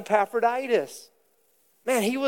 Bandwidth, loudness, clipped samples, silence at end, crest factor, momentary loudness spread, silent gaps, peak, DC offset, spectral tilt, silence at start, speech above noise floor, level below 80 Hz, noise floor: 17.5 kHz; -25 LUFS; under 0.1%; 0 s; 18 dB; 14 LU; none; -8 dBFS; under 0.1%; -4 dB/octave; 0 s; 42 dB; -84 dBFS; -66 dBFS